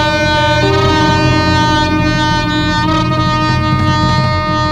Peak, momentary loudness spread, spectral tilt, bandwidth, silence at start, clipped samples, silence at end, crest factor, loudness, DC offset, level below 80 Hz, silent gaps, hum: 0 dBFS; 2 LU; -5.5 dB/octave; 11.5 kHz; 0 s; under 0.1%; 0 s; 12 dB; -12 LUFS; under 0.1%; -26 dBFS; none; none